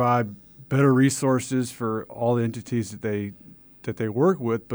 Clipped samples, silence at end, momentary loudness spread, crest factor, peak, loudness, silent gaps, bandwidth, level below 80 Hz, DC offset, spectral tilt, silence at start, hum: under 0.1%; 0 s; 13 LU; 16 dB; -8 dBFS; -24 LUFS; none; over 20 kHz; -62 dBFS; under 0.1%; -6.5 dB/octave; 0 s; none